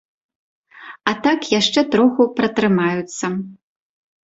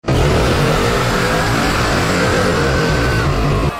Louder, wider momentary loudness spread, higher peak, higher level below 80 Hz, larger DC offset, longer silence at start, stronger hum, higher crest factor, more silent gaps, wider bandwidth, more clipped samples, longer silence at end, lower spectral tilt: second, -18 LUFS vs -15 LUFS; first, 10 LU vs 2 LU; about the same, -2 dBFS vs -2 dBFS; second, -60 dBFS vs -24 dBFS; neither; first, 0.75 s vs 0.05 s; neither; first, 18 dB vs 12 dB; neither; second, 8 kHz vs 16 kHz; neither; first, 0.7 s vs 0 s; about the same, -4.5 dB/octave vs -5 dB/octave